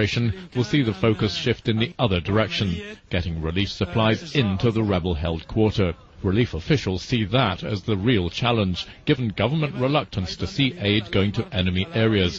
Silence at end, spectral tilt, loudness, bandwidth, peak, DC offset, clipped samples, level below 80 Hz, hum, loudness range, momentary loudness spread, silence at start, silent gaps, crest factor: 0 s; -6.5 dB/octave; -23 LUFS; 7.8 kHz; -6 dBFS; under 0.1%; under 0.1%; -42 dBFS; none; 1 LU; 6 LU; 0 s; none; 16 dB